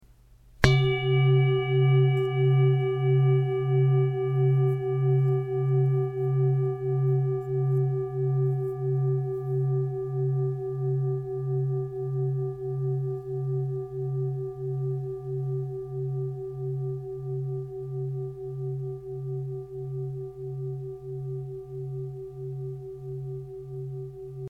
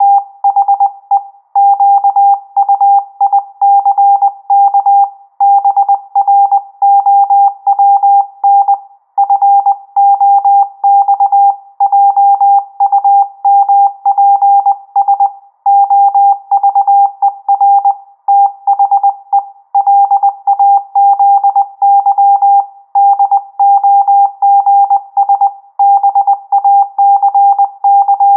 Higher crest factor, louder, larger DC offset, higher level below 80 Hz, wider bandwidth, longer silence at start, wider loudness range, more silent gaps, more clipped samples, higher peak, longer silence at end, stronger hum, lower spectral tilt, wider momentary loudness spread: first, 26 dB vs 8 dB; second, -27 LUFS vs -9 LUFS; neither; first, -50 dBFS vs under -90 dBFS; first, 6.6 kHz vs 1.3 kHz; first, 0.6 s vs 0 s; first, 12 LU vs 1 LU; neither; neither; about the same, 0 dBFS vs -2 dBFS; about the same, 0 s vs 0 s; neither; first, -8.5 dB/octave vs -4.5 dB/octave; first, 14 LU vs 5 LU